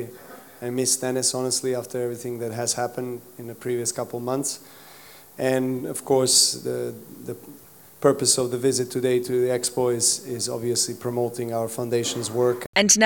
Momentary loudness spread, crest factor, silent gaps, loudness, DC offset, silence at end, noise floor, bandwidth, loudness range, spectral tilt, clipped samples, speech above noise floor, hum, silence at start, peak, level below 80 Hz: 16 LU; 22 dB; 12.66-12.73 s; -23 LUFS; under 0.1%; 0 s; -48 dBFS; 18 kHz; 6 LU; -3 dB/octave; under 0.1%; 24 dB; none; 0 s; -2 dBFS; -68 dBFS